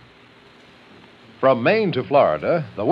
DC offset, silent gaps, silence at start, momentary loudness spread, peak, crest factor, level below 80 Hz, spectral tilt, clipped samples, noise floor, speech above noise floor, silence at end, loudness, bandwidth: under 0.1%; none; 1.4 s; 5 LU; -4 dBFS; 18 dB; -60 dBFS; -8.5 dB/octave; under 0.1%; -49 dBFS; 31 dB; 0 s; -19 LUFS; 5.8 kHz